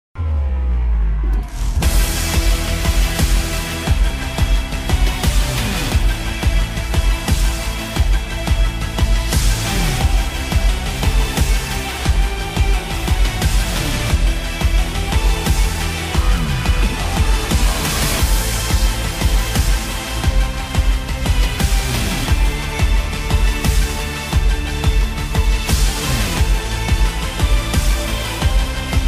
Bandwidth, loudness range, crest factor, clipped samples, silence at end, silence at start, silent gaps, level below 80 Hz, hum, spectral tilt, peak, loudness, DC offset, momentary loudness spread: 16 kHz; 1 LU; 12 dB; under 0.1%; 0 s; 0.15 s; none; -18 dBFS; none; -4 dB/octave; -4 dBFS; -19 LUFS; under 0.1%; 3 LU